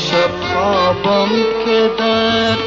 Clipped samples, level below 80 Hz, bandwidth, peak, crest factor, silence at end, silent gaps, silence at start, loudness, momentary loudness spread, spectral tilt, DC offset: under 0.1%; -44 dBFS; 7.8 kHz; -2 dBFS; 12 dB; 0 s; none; 0 s; -14 LUFS; 2 LU; -2.5 dB/octave; under 0.1%